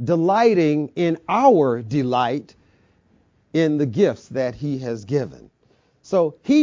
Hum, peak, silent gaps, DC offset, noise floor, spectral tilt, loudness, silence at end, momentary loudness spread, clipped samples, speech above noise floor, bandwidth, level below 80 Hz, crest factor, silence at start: none; -4 dBFS; none; under 0.1%; -61 dBFS; -7.5 dB/octave; -20 LUFS; 0 s; 10 LU; under 0.1%; 42 dB; 7.6 kHz; -58 dBFS; 18 dB; 0 s